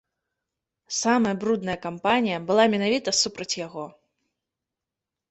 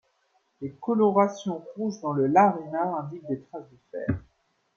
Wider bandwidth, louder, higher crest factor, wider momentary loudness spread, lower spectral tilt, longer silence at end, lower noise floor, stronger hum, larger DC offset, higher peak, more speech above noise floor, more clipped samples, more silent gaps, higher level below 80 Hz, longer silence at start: first, 8.4 kHz vs 7 kHz; about the same, -24 LUFS vs -26 LUFS; about the same, 20 dB vs 20 dB; second, 10 LU vs 19 LU; second, -3.5 dB/octave vs -7.5 dB/octave; first, 1.4 s vs 0.55 s; first, -87 dBFS vs -70 dBFS; neither; neither; about the same, -6 dBFS vs -6 dBFS; first, 64 dB vs 44 dB; neither; neither; second, -64 dBFS vs -58 dBFS; first, 0.9 s vs 0.6 s